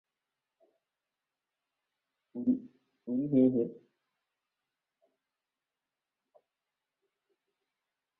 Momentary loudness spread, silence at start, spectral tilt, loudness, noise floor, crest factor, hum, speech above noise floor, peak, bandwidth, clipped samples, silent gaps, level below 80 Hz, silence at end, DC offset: 16 LU; 2.35 s; -12 dB/octave; -31 LUFS; under -90 dBFS; 22 dB; none; over 61 dB; -16 dBFS; 2.5 kHz; under 0.1%; none; -76 dBFS; 4.45 s; under 0.1%